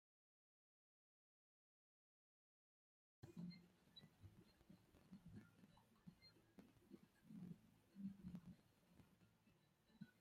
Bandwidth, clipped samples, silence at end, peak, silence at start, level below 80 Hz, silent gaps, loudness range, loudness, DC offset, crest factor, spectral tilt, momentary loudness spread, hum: 14.5 kHz; under 0.1%; 0 s; -44 dBFS; 3.2 s; -86 dBFS; none; 6 LU; -63 LUFS; under 0.1%; 22 dB; -7 dB/octave; 11 LU; none